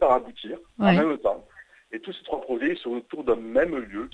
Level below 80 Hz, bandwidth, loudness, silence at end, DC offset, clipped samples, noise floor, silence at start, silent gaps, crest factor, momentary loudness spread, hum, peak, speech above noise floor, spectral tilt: -54 dBFS; 9.2 kHz; -25 LUFS; 0.05 s; under 0.1%; under 0.1%; -46 dBFS; 0 s; none; 20 dB; 16 LU; none; -6 dBFS; 21 dB; -8 dB/octave